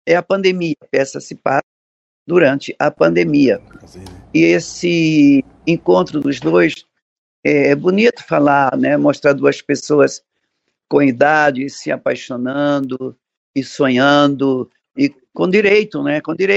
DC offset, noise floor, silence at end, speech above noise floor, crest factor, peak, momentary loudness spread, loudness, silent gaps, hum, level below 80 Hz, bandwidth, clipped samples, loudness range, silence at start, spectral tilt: under 0.1%; -71 dBFS; 0 s; 57 dB; 14 dB; 0 dBFS; 10 LU; -15 LUFS; 1.63-2.26 s, 7.02-7.43 s, 13.37-13.54 s; none; -56 dBFS; 8.2 kHz; under 0.1%; 3 LU; 0.05 s; -6 dB/octave